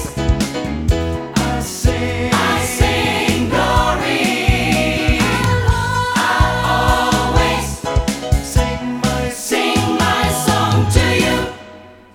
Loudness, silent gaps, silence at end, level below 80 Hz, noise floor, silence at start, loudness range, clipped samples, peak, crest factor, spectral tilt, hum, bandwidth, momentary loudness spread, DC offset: -16 LUFS; none; 0.2 s; -24 dBFS; -39 dBFS; 0 s; 2 LU; under 0.1%; 0 dBFS; 16 dB; -4.5 dB/octave; none; 18 kHz; 5 LU; under 0.1%